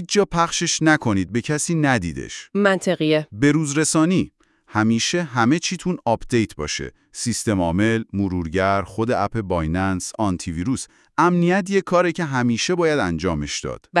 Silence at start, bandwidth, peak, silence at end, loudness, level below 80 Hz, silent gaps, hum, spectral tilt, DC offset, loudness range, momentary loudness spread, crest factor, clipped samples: 0 s; 12 kHz; -2 dBFS; 0 s; -21 LUFS; -46 dBFS; none; none; -4.5 dB/octave; under 0.1%; 2 LU; 8 LU; 18 dB; under 0.1%